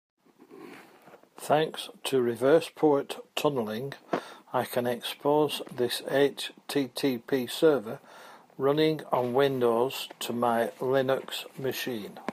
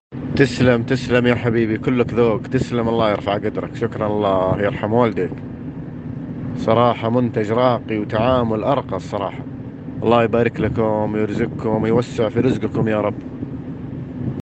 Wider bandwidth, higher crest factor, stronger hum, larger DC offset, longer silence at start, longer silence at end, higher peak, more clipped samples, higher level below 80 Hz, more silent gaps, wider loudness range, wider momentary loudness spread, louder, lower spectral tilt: first, 15.5 kHz vs 8.6 kHz; about the same, 18 dB vs 18 dB; neither; neither; first, 0.5 s vs 0.1 s; about the same, 0 s vs 0 s; second, -10 dBFS vs 0 dBFS; neither; second, -78 dBFS vs -46 dBFS; neither; about the same, 2 LU vs 3 LU; second, 10 LU vs 14 LU; second, -28 LUFS vs -19 LUFS; second, -5 dB/octave vs -7.5 dB/octave